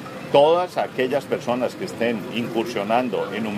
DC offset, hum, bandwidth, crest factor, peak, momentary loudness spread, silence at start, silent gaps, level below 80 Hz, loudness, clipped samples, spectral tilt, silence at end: under 0.1%; none; 15.5 kHz; 20 dB; -2 dBFS; 8 LU; 0 s; none; -64 dBFS; -22 LUFS; under 0.1%; -5.5 dB/octave; 0 s